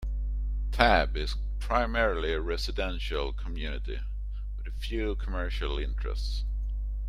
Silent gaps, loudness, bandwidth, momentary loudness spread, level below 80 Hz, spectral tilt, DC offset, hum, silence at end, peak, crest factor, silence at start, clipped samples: none; -31 LUFS; 10 kHz; 12 LU; -32 dBFS; -5.5 dB/octave; under 0.1%; 50 Hz at -35 dBFS; 0 s; -4 dBFS; 24 dB; 0 s; under 0.1%